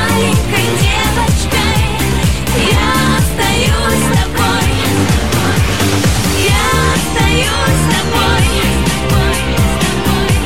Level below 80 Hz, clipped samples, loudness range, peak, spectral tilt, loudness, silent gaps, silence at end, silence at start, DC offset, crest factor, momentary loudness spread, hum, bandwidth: -20 dBFS; under 0.1%; 1 LU; 0 dBFS; -4.5 dB/octave; -12 LUFS; none; 0 s; 0 s; 5%; 12 dB; 2 LU; none; 16.5 kHz